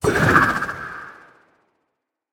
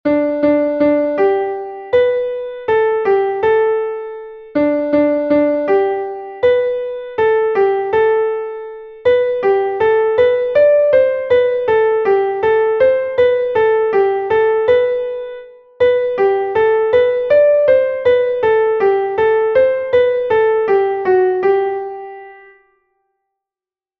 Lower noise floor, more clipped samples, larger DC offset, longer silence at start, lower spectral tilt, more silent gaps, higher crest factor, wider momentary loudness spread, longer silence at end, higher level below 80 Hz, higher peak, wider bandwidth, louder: second, -77 dBFS vs under -90 dBFS; neither; neither; about the same, 0 s vs 0.05 s; second, -5.5 dB/octave vs -7.5 dB/octave; neither; first, 20 dB vs 14 dB; first, 21 LU vs 9 LU; second, 1.2 s vs 1.65 s; first, -44 dBFS vs -52 dBFS; about the same, -2 dBFS vs -2 dBFS; first, 19 kHz vs 5.2 kHz; second, -17 LUFS vs -14 LUFS